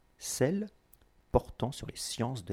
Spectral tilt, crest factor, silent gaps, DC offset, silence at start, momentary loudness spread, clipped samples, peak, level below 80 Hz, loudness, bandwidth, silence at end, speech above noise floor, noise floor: -5 dB/octave; 24 dB; none; under 0.1%; 0.2 s; 7 LU; under 0.1%; -10 dBFS; -48 dBFS; -34 LUFS; 17 kHz; 0 s; 31 dB; -64 dBFS